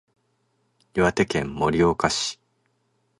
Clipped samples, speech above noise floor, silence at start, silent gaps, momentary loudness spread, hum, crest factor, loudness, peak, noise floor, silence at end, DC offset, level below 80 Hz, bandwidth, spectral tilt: under 0.1%; 48 dB; 0.95 s; none; 9 LU; none; 22 dB; -23 LUFS; -4 dBFS; -70 dBFS; 0.85 s; under 0.1%; -48 dBFS; 11.5 kHz; -4.5 dB/octave